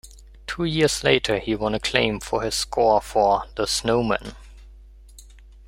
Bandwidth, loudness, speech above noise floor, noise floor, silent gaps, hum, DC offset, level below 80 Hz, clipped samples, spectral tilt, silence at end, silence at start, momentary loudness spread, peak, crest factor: 16 kHz; -22 LUFS; 24 dB; -45 dBFS; none; none; under 0.1%; -42 dBFS; under 0.1%; -4 dB/octave; 0.35 s; 0.05 s; 8 LU; -2 dBFS; 22 dB